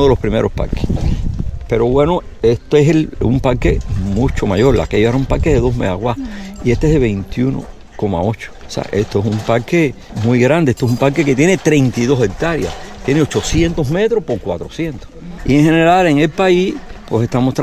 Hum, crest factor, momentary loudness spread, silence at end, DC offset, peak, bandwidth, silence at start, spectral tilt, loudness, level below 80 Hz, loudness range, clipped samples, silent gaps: none; 14 dB; 11 LU; 0 s; under 0.1%; 0 dBFS; 15.5 kHz; 0 s; -6.5 dB/octave; -15 LUFS; -26 dBFS; 4 LU; under 0.1%; none